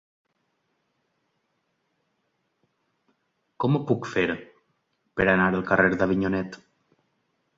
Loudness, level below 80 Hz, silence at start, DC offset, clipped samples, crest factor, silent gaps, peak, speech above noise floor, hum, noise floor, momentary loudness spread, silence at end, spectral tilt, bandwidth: -24 LUFS; -54 dBFS; 3.6 s; under 0.1%; under 0.1%; 24 dB; none; -4 dBFS; 51 dB; none; -75 dBFS; 11 LU; 1 s; -7.5 dB/octave; 7.6 kHz